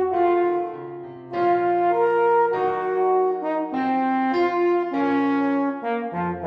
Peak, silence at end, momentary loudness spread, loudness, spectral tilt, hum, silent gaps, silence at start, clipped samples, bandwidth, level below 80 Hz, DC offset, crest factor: -10 dBFS; 0 s; 8 LU; -22 LUFS; -8 dB/octave; none; none; 0 s; under 0.1%; 5.8 kHz; -64 dBFS; under 0.1%; 12 dB